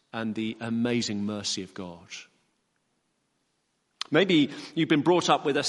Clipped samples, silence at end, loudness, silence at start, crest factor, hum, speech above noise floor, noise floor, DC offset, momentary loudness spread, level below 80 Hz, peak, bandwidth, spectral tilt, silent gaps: under 0.1%; 0 s; -26 LUFS; 0.15 s; 22 dB; none; 48 dB; -75 dBFS; under 0.1%; 18 LU; -72 dBFS; -6 dBFS; 11.5 kHz; -4.5 dB/octave; none